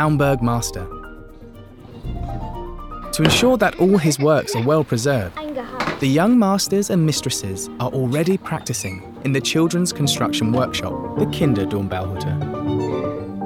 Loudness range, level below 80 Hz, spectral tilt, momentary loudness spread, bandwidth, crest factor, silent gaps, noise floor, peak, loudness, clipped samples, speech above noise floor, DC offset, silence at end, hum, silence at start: 4 LU; -40 dBFS; -5 dB/octave; 14 LU; 17.5 kHz; 20 dB; none; -39 dBFS; 0 dBFS; -19 LUFS; under 0.1%; 21 dB; under 0.1%; 0 s; none; 0 s